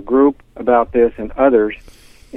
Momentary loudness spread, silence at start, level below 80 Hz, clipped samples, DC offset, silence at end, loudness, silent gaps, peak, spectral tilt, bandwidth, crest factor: 9 LU; 0 s; -40 dBFS; under 0.1%; under 0.1%; 0 s; -15 LUFS; none; 0 dBFS; -7.5 dB/octave; 11 kHz; 14 dB